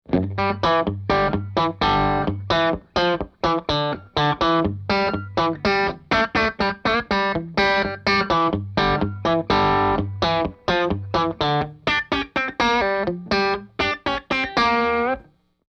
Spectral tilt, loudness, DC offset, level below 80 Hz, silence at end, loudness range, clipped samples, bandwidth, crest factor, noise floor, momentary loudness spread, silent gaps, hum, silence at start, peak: -6 dB/octave; -21 LUFS; under 0.1%; -40 dBFS; 0.45 s; 2 LU; under 0.1%; 8.2 kHz; 16 dB; -46 dBFS; 5 LU; none; none; 0.1 s; -6 dBFS